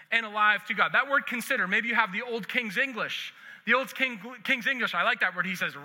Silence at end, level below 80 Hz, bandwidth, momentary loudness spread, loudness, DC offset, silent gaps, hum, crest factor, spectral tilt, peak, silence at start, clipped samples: 0 s; under -90 dBFS; 17 kHz; 8 LU; -26 LUFS; under 0.1%; none; none; 20 dB; -3 dB/octave; -8 dBFS; 0 s; under 0.1%